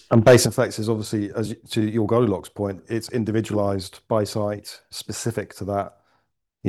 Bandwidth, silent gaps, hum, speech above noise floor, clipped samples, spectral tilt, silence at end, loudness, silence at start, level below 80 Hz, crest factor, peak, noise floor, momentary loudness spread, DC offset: 15 kHz; none; none; 49 dB; under 0.1%; -5.5 dB/octave; 0 s; -23 LUFS; 0.1 s; -56 dBFS; 18 dB; -4 dBFS; -70 dBFS; 14 LU; under 0.1%